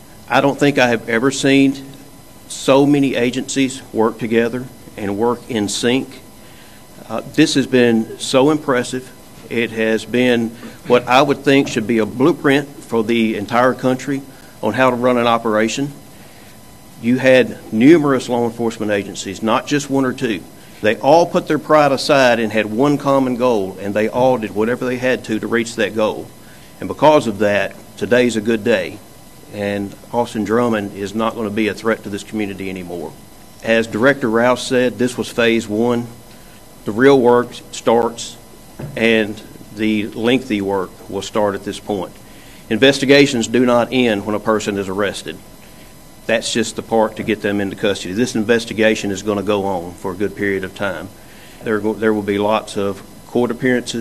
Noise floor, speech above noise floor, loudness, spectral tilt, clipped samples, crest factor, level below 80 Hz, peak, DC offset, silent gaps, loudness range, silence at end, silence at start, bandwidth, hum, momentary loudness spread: -41 dBFS; 25 dB; -17 LUFS; -5 dB/octave; under 0.1%; 16 dB; -50 dBFS; 0 dBFS; 0.6%; none; 5 LU; 0 s; 0.2 s; 14 kHz; none; 13 LU